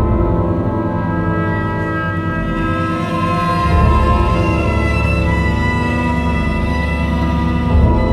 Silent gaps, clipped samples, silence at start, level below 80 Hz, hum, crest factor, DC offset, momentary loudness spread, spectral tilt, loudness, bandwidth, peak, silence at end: none; under 0.1%; 0 s; -20 dBFS; none; 14 dB; under 0.1%; 5 LU; -8 dB/octave; -16 LUFS; 11.5 kHz; 0 dBFS; 0 s